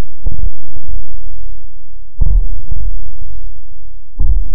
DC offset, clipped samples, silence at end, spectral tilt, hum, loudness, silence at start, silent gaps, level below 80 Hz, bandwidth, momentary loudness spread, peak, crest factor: 70%; under 0.1%; 0 s; -14.5 dB/octave; none; -24 LUFS; 0 s; none; -18 dBFS; 1.1 kHz; 24 LU; 0 dBFS; 14 dB